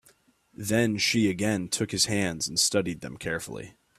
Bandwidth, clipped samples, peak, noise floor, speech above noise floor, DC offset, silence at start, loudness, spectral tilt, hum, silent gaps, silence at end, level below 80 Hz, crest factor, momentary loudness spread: 15.5 kHz; under 0.1%; -10 dBFS; -62 dBFS; 35 dB; under 0.1%; 0.6 s; -26 LUFS; -3.5 dB/octave; none; none; 0.3 s; -58 dBFS; 18 dB; 12 LU